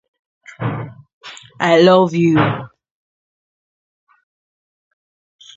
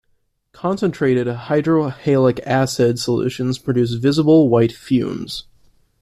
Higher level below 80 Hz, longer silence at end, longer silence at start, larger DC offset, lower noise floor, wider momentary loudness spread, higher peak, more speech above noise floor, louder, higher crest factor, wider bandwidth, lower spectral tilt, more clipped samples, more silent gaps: about the same, -56 dBFS vs -52 dBFS; first, 2.9 s vs 0.6 s; about the same, 0.6 s vs 0.65 s; neither; first, under -90 dBFS vs -64 dBFS; first, 25 LU vs 10 LU; first, 0 dBFS vs -4 dBFS; first, over 78 dB vs 47 dB; first, -14 LUFS vs -18 LUFS; first, 20 dB vs 14 dB; second, 7.8 kHz vs 14 kHz; about the same, -7 dB/octave vs -6.5 dB/octave; neither; first, 1.13-1.21 s vs none